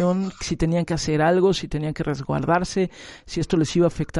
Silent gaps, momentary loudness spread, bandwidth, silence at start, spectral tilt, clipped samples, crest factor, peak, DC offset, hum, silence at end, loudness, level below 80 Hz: none; 9 LU; 11.5 kHz; 0 s; -6 dB/octave; under 0.1%; 16 dB; -6 dBFS; under 0.1%; none; 0 s; -23 LUFS; -42 dBFS